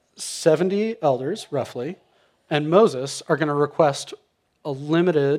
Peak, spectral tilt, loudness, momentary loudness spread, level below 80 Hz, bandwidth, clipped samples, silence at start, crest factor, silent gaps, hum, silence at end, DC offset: -2 dBFS; -5.5 dB/octave; -22 LUFS; 14 LU; -72 dBFS; 14.5 kHz; under 0.1%; 0.2 s; 20 dB; none; none; 0 s; under 0.1%